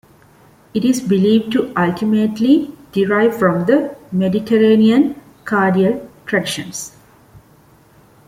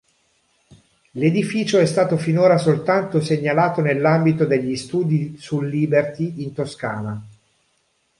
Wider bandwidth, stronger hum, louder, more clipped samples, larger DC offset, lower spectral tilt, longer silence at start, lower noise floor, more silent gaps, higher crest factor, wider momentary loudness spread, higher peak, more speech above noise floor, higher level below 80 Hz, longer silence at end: first, 16 kHz vs 11.5 kHz; neither; first, -16 LUFS vs -19 LUFS; neither; neither; about the same, -6 dB/octave vs -7 dB/octave; second, 0.75 s vs 1.15 s; second, -49 dBFS vs -66 dBFS; neither; about the same, 14 dB vs 16 dB; about the same, 11 LU vs 10 LU; about the same, -2 dBFS vs -4 dBFS; second, 34 dB vs 47 dB; about the same, -56 dBFS vs -60 dBFS; about the same, 0.9 s vs 0.9 s